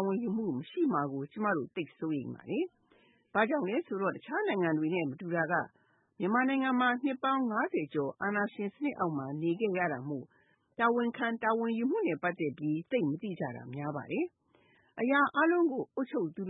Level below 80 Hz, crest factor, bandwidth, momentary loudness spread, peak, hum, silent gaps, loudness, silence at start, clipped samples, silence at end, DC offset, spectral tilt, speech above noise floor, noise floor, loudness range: -80 dBFS; 18 dB; 4 kHz; 9 LU; -14 dBFS; none; none; -32 LUFS; 0 s; under 0.1%; 0 s; under 0.1%; -10 dB/octave; 35 dB; -67 dBFS; 3 LU